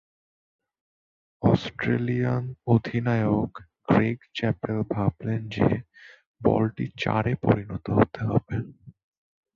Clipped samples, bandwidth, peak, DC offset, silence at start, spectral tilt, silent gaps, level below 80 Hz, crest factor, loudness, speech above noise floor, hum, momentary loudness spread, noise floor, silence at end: under 0.1%; 7 kHz; -6 dBFS; under 0.1%; 1.4 s; -8.5 dB/octave; 6.27-6.34 s; -50 dBFS; 20 dB; -26 LUFS; over 65 dB; none; 7 LU; under -90 dBFS; 0.65 s